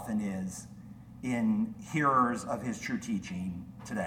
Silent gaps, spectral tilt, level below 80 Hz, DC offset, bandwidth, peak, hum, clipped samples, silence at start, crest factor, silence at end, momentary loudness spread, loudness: none; -6 dB/octave; -60 dBFS; under 0.1%; 16 kHz; -16 dBFS; none; under 0.1%; 0 s; 18 dB; 0 s; 17 LU; -32 LUFS